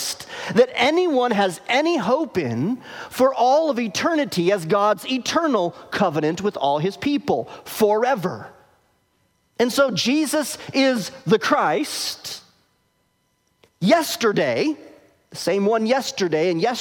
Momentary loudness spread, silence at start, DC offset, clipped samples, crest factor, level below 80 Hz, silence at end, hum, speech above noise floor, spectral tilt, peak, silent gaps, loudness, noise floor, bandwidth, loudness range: 9 LU; 0 s; under 0.1%; under 0.1%; 18 dB; -64 dBFS; 0 s; none; 47 dB; -4.5 dB/octave; -4 dBFS; none; -21 LUFS; -67 dBFS; 18 kHz; 3 LU